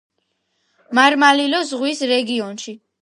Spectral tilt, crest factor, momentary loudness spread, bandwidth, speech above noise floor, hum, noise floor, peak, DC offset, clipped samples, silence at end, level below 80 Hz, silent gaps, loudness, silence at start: -2.5 dB/octave; 18 dB; 17 LU; 11.5 kHz; 53 dB; none; -70 dBFS; 0 dBFS; under 0.1%; under 0.1%; 0.25 s; -74 dBFS; none; -16 LUFS; 0.9 s